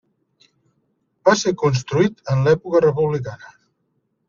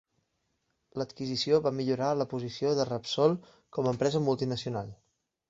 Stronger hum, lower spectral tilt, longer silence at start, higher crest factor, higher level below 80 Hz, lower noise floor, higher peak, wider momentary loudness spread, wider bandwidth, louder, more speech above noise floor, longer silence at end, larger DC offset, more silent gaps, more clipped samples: neither; about the same, -6 dB/octave vs -6 dB/octave; first, 1.25 s vs 0.95 s; about the same, 18 dB vs 20 dB; first, -56 dBFS vs -66 dBFS; second, -70 dBFS vs -78 dBFS; first, -2 dBFS vs -10 dBFS; second, 8 LU vs 11 LU; about the same, 7.4 kHz vs 8 kHz; first, -19 LUFS vs -30 LUFS; about the same, 52 dB vs 49 dB; first, 0.95 s vs 0.55 s; neither; neither; neither